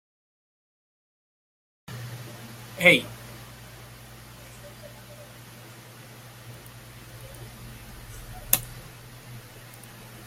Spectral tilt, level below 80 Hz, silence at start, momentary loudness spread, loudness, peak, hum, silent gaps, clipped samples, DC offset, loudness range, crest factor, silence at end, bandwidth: -3 dB/octave; -54 dBFS; 1.85 s; 22 LU; -22 LUFS; 0 dBFS; none; none; under 0.1%; under 0.1%; 18 LU; 34 dB; 0 s; 16.5 kHz